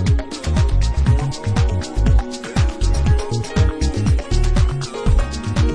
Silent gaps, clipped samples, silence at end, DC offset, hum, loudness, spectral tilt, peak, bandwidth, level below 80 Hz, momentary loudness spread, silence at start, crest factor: none; under 0.1%; 0 s; under 0.1%; none; -19 LUFS; -6 dB/octave; -4 dBFS; 10.5 kHz; -18 dBFS; 3 LU; 0 s; 12 dB